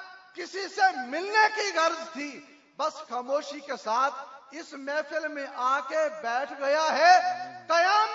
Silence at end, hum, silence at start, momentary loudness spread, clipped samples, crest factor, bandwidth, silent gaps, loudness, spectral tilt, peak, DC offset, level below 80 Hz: 0 s; none; 0 s; 17 LU; under 0.1%; 20 dB; 7.8 kHz; none; -26 LUFS; -1 dB/octave; -8 dBFS; under 0.1%; -88 dBFS